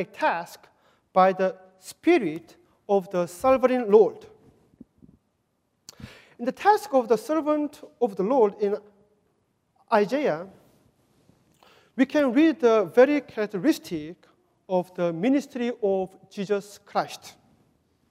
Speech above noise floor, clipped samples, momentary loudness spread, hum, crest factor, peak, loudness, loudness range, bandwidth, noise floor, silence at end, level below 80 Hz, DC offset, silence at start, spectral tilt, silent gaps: 49 dB; under 0.1%; 16 LU; none; 20 dB; -4 dBFS; -24 LUFS; 5 LU; 16 kHz; -73 dBFS; 0.8 s; -66 dBFS; under 0.1%; 0 s; -6 dB/octave; none